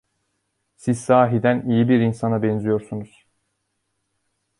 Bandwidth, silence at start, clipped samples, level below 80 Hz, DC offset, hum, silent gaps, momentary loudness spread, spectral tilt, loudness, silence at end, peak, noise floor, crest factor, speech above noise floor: 11.5 kHz; 0.85 s; under 0.1%; -58 dBFS; under 0.1%; none; none; 11 LU; -7.5 dB/octave; -20 LUFS; 1.55 s; -2 dBFS; -74 dBFS; 20 dB; 55 dB